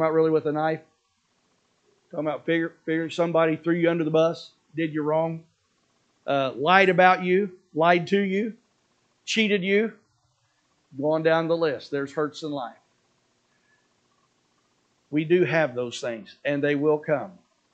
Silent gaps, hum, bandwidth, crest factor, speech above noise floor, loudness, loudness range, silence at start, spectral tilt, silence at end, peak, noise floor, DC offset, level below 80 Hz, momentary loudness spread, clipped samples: none; none; 8.6 kHz; 24 dB; 47 dB; -24 LUFS; 7 LU; 0 s; -6 dB/octave; 0.45 s; -2 dBFS; -70 dBFS; under 0.1%; -78 dBFS; 13 LU; under 0.1%